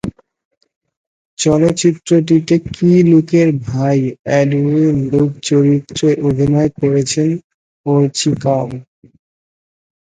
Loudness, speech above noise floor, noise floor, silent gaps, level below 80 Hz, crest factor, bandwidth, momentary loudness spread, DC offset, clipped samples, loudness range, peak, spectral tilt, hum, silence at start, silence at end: -14 LUFS; over 77 dB; under -90 dBFS; 0.45-0.51 s, 0.57-0.61 s, 0.76-0.81 s, 0.97-1.37 s, 4.19-4.25 s, 7.44-7.84 s; -46 dBFS; 14 dB; 9.6 kHz; 7 LU; under 0.1%; under 0.1%; 3 LU; 0 dBFS; -6.5 dB/octave; none; 0.05 s; 1.25 s